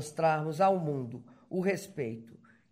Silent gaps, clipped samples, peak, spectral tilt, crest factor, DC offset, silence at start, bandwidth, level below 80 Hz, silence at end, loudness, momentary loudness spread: none; under 0.1%; -14 dBFS; -6.5 dB/octave; 18 dB; under 0.1%; 0 s; 16 kHz; -74 dBFS; 0.4 s; -31 LUFS; 15 LU